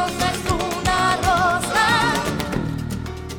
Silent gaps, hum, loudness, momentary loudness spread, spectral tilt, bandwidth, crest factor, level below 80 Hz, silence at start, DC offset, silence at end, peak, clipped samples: none; none; -20 LUFS; 10 LU; -4 dB/octave; 19 kHz; 12 dB; -36 dBFS; 0 s; under 0.1%; 0 s; -8 dBFS; under 0.1%